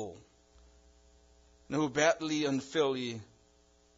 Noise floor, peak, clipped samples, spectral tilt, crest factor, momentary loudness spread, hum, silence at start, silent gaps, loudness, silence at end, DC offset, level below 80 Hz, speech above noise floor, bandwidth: -66 dBFS; -12 dBFS; under 0.1%; -3.5 dB/octave; 22 dB; 13 LU; none; 0 s; none; -32 LUFS; 0.75 s; under 0.1%; -66 dBFS; 35 dB; 7.4 kHz